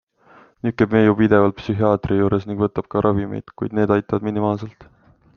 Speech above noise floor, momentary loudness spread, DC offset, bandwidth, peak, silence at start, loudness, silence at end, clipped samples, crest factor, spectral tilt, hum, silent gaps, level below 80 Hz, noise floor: 32 dB; 12 LU; under 0.1%; 6.6 kHz; -2 dBFS; 0.65 s; -19 LUFS; 0.55 s; under 0.1%; 18 dB; -9.5 dB/octave; none; none; -48 dBFS; -51 dBFS